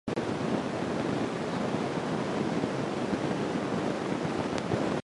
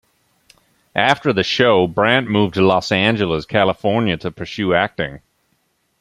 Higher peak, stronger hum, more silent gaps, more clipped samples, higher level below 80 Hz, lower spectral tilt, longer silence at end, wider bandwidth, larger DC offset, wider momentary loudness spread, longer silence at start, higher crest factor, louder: second, -14 dBFS vs 0 dBFS; neither; neither; neither; second, -58 dBFS vs -50 dBFS; about the same, -6 dB/octave vs -6 dB/octave; second, 0 s vs 0.8 s; about the same, 11.5 kHz vs 12 kHz; neither; second, 1 LU vs 9 LU; second, 0.05 s vs 0.95 s; about the same, 16 dB vs 18 dB; second, -31 LUFS vs -17 LUFS